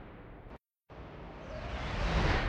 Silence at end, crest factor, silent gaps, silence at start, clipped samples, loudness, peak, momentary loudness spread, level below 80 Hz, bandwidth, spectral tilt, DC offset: 0 s; 18 dB; none; 0 s; under 0.1%; -37 LUFS; -18 dBFS; 22 LU; -40 dBFS; 8.8 kHz; -6 dB/octave; under 0.1%